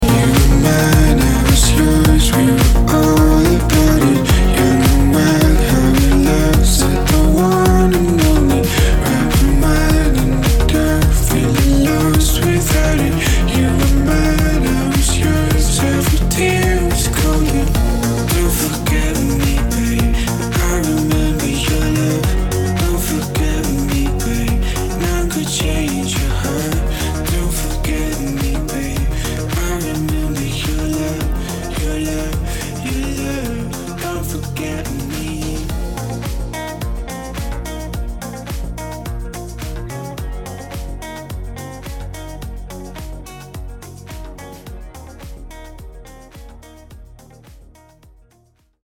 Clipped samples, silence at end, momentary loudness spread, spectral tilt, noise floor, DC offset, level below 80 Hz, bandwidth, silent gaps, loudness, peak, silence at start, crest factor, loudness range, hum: under 0.1%; 1.3 s; 17 LU; -5 dB/octave; -56 dBFS; under 0.1%; -18 dBFS; 18 kHz; none; -15 LUFS; -2 dBFS; 0 s; 14 dB; 17 LU; none